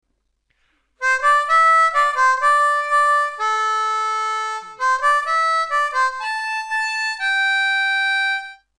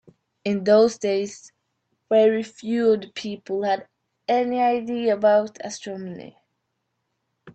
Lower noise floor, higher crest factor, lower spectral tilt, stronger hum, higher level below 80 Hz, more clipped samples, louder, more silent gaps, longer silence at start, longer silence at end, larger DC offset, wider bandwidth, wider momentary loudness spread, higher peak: second, -69 dBFS vs -76 dBFS; about the same, 14 dB vs 18 dB; second, 3 dB/octave vs -5 dB/octave; neither; first, -62 dBFS vs -70 dBFS; neither; first, -18 LUFS vs -22 LUFS; neither; first, 1 s vs 0.45 s; first, 0.25 s vs 0.05 s; neither; first, 12 kHz vs 8.6 kHz; second, 8 LU vs 15 LU; about the same, -6 dBFS vs -6 dBFS